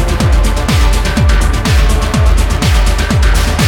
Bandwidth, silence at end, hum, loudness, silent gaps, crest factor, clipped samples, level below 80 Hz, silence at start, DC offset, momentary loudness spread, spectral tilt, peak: 16.5 kHz; 0 s; none; -12 LUFS; none; 8 dB; under 0.1%; -12 dBFS; 0 s; under 0.1%; 1 LU; -5 dB/octave; 0 dBFS